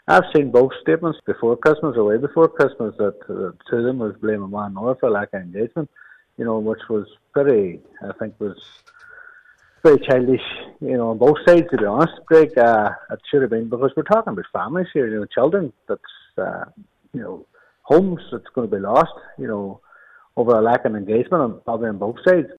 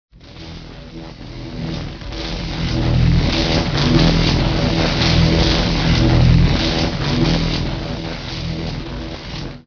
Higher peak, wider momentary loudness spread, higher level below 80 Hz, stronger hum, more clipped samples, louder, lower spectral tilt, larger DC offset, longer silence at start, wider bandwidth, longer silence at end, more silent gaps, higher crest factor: about the same, -2 dBFS vs 0 dBFS; second, 15 LU vs 19 LU; second, -56 dBFS vs -24 dBFS; neither; neither; about the same, -19 LUFS vs -17 LUFS; first, -8 dB/octave vs -6 dB/octave; neither; second, 0.1 s vs 0.25 s; first, 8.4 kHz vs 5.4 kHz; about the same, 0.05 s vs 0.05 s; neither; about the same, 18 dB vs 16 dB